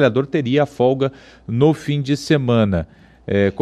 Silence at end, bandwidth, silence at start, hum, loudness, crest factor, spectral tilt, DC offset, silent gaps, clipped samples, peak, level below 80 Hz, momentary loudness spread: 0 s; 12.5 kHz; 0 s; none; -18 LUFS; 14 dB; -7 dB/octave; under 0.1%; none; under 0.1%; -4 dBFS; -44 dBFS; 9 LU